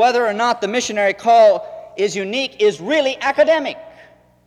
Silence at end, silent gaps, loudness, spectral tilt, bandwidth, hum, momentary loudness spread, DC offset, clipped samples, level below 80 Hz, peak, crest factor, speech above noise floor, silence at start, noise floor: 0.6 s; none; -16 LUFS; -3 dB/octave; 11.5 kHz; none; 11 LU; under 0.1%; under 0.1%; -62 dBFS; -4 dBFS; 14 dB; 32 dB; 0 s; -47 dBFS